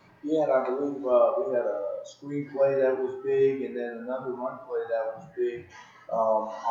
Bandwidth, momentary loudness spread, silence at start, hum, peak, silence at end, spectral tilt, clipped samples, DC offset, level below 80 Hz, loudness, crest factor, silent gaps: 7.4 kHz; 11 LU; 0.25 s; none; -10 dBFS; 0 s; -7 dB/octave; under 0.1%; under 0.1%; -76 dBFS; -28 LUFS; 16 dB; none